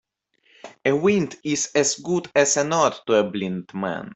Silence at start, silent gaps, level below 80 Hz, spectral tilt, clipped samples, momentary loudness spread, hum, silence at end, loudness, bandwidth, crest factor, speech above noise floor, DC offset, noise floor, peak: 0.65 s; none; -64 dBFS; -3.5 dB/octave; under 0.1%; 9 LU; none; 0 s; -22 LUFS; 8.4 kHz; 18 dB; 42 dB; under 0.1%; -64 dBFS; -4 dBFS